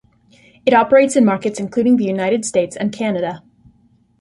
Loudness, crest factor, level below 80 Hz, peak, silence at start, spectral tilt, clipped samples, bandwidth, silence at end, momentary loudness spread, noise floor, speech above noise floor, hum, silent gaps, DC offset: -16 LUFS; 16 dB; -58 dBFS; -2 dBFS; 0.65 s; -5.5 dB/octave; under 0.1%; 11.5 kHz; 0.8 s; 10 LU; -55 dBFS; 40 dB; none; none; under 0.1%